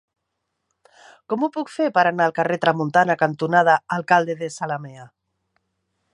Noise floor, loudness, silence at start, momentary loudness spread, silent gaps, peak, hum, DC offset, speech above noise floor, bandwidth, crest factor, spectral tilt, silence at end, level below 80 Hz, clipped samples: -77 dBFS; -20 LUFS; 1.3 s; 10 LU; none; -2 dBFS; none; under 0.1%; 57 dB; 11 kHz; 20 dB; -5.5 dB/octave; 1.05 s; -70 dBFS; under 0.1%